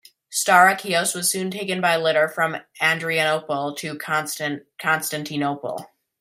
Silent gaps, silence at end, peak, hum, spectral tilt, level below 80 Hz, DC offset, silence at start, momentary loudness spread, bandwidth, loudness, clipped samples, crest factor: none; 0.35 s; 0 dBFS; none; -2.5 dB/octave; -70 dBFS; under 0.1%; 0.3 s; 12 LU; 16 kHz; -21 LUFS; under 0.1%; 22 dB